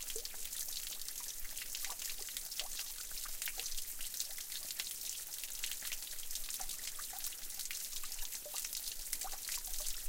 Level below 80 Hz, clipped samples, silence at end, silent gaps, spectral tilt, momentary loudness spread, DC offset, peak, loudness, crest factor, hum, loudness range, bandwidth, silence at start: -54 dBFS; under 0.1%; 0 s; none; 1.5 dB/octave; 2 LU; under 0.1%; -20 dBFS; -41 LUFS; 22 dB; none; 1 LU; 17 kHz; 0 s